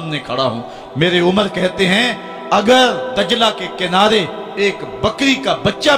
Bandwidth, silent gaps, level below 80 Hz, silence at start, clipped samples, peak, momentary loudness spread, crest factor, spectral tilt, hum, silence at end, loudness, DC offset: 16 kHz; none; -46 dBFS; 0 s; under 0.1%; 0 dBFS; 9 LU; 14 dB; -4.5 dB/octave; none; 0 s; -15 LUFS; under 0.1%